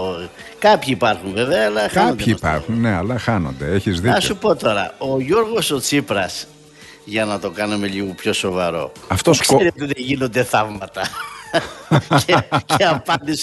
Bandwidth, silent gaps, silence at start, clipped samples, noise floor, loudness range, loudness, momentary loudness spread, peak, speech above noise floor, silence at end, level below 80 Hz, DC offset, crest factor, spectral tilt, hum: 12.5 kHz; none; 0 s; under 0.1%; -43 dBFS; 3 LU; -18 LUFS; 10 LU; 0 dBFS; 25 dB; 0 s; -44 dBFS; under 0.1%; 18 dB; -4.5 dB/octave; none